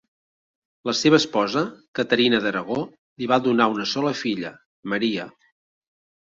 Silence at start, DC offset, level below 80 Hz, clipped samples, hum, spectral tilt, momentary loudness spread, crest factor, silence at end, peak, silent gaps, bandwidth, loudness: 0.85 s; under 0.1%; -64 dBFS; under 0.1%; none; -4.5 dB/octave; 14 LU; 20 dB; 0.9 s; -2 dBFS; 1.88-1.93 s, 2.98-3.16 s, 4.66-4.83 s; 7.8 kHz; -22 LUFS